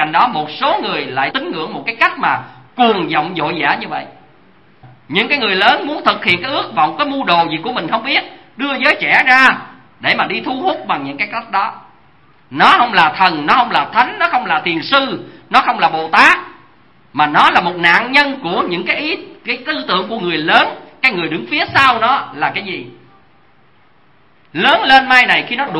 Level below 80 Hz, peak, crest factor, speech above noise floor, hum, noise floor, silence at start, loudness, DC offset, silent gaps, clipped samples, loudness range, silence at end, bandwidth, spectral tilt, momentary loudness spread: -54 dBFS; 0 dBFS; 14 dB; 38 dB; none; -52 dBFS; 0 s; -13 LUFS; 0.3%; none; 0.2%; 4 LU; 0 s; 11 kHz; -4.5 dB/octave; 12 LU